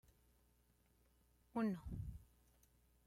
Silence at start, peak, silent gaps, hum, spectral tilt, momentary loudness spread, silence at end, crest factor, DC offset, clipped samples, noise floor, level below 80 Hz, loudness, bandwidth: 1.55 s; -32 dBFS; none; 60 Hz at -65 dBFS; -8.5 dB/octave; 12 LU; 0.85 s; 18 dB; under 0.1%; under 0.1%; -76 dBFS; -62 dBFS; -46 LUFS; 16 kHz